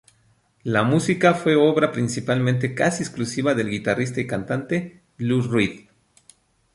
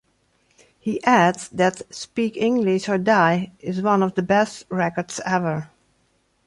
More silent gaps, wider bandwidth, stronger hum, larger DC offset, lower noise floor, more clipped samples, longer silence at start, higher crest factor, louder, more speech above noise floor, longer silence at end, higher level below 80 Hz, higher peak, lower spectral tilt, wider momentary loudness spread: neither; about the same, 11.5 kHz vs 11.5 kHz; neither; neither; about the same, -62 dBFS vs -65 dBFS; neither; second, 0.65 s vs 0.85 s; about the same, 20 dB vs 18 dB; about the same, -22 LUFS vs -21 LUFS; second, 41 dB vs 45 dB; first, 0.95 s vs 0.8 s; about the same, -58 dBFS vs -62 dBFS; about the same, -2 dBFS vs -4 dBFS; about the same, -6 dB/octave vs -5.5 dB/octave; about the same, 9 LU vs 11 LU